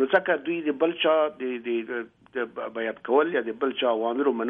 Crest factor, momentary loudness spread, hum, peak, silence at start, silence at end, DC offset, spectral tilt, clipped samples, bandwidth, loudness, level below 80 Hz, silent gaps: 18 dB; 10 LU; none; -8 dBFS; 0 s; 0 s; under 0.1%; -7.5 dB/octave; under 0.1%; 4 kHz; -26 LUFS; -74 dBFS; none